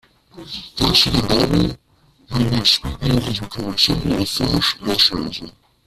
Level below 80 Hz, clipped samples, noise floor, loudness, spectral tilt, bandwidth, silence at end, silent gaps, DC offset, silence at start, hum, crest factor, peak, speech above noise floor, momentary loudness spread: -36 dBFS; under 0.1%; -42 dBFS; -17 LUFS; -4.5 dB/octave; 15.5 kHz; 0.35 s; none; under 0.1%; 0.35 s; none; 18 dB; 0 dBFS; 23 dB; 13 LU